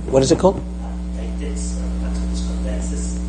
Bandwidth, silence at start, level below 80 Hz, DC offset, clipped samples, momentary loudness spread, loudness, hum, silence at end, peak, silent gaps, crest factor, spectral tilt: 10 kHz; 0 s; -26 dBFS; under 0.1%; under 0.1%; 12 LU; -22 LUFS; none; 0 s; 0 dBFS; none; 20 dB; -6 dB/octave